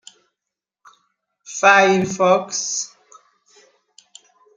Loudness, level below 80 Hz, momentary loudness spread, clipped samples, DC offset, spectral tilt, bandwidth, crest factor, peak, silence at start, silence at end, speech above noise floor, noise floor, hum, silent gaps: -16 LUFS; -64 dBFS; 16 LU; under 0.1%; under 0.1%; -3 dB/octave; 9.6 kHz; 20 dB; -2 dBFS; 1.5 s; 1.7 s; 69 dB; -85 dBFS; none; none